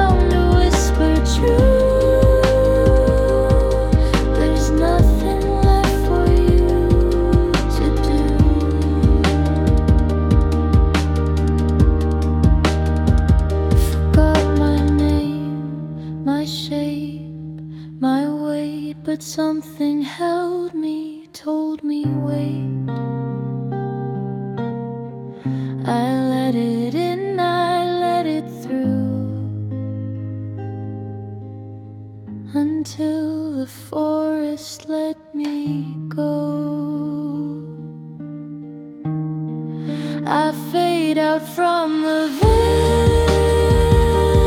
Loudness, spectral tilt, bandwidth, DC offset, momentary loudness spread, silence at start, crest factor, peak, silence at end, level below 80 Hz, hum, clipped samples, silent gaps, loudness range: -19 LUFS; -7 dB/octave; 15.5 kHz; under 0.1%; 14 LU; 0 s; 14 dB; -2 dBFS; 0 s; -22 dBFS; none; under 0.1%; none; 10 LU